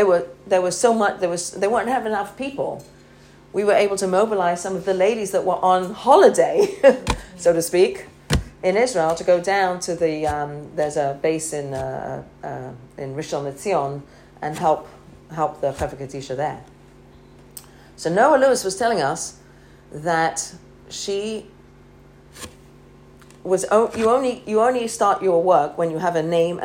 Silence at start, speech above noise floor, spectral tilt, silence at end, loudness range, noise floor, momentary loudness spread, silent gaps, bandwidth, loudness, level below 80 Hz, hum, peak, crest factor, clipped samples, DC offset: 0 s; 28 dB; -4.5 dB/octave; 0 s; 10 LU; -48 dBFS; 16 LU; none; 16 kHz; -20 LUFS; -44 dBFS; none; 0 dBFS; 20 dB; under 0.1%; under 0.1%